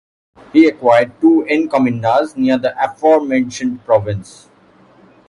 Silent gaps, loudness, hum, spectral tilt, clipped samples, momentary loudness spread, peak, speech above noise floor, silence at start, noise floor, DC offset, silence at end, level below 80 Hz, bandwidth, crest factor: none; -14 LUFS; none; -6.5 dB/octave; under 0.1%; 7 LU; 0 dBFS; 34 dB; 0.55 s; -48 dBFS; under 0.1%; 1.05 s; -50 dBFS; 11 kHz; 14 dB